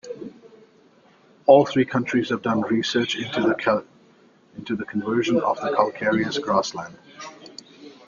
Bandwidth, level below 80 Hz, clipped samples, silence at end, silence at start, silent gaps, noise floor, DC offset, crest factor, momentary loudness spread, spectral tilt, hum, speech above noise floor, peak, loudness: 7.4 kHz; -64 dBFS; under 0.1%; 0.15 s; 0.05 s; none; -55 dBFS; under 0.1%; 22 dB; 23 LU; -5.5 dB/octave; none; 34 dB; -2 dBFS; -22 LUFS